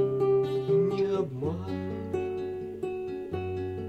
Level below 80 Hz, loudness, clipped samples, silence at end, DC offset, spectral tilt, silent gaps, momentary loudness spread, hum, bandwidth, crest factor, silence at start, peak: -58 dBFS; -30 LUFS; under 0.1%; 0 s; under 0.1%; -8.5 dB/octave; none; 9 LU; none; 8 kHz; 14 dB; 0 s; -16 dBFS